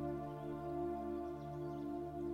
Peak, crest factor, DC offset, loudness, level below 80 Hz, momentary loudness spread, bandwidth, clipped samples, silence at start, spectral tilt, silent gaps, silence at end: -32 dBFS; 12 dB; under 0.1%; -44 LUFS; -60 dBFS; 4 LU; 15.5 kHz; under 0.1%; 0 s; -9 dB/octave; none; 0 s